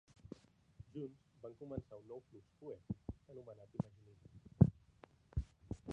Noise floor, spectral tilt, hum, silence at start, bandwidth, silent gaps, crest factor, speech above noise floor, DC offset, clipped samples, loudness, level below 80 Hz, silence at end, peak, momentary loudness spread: -66 dBFS; -10.5 dB/octave; none; 0.8 s; 7.8 kHz; none; 30 dB; 17 dB; under 0.1%; under 0.1%; -42 LUFS; -56 dBFS; 0 s; -14 dBFS; 25 LU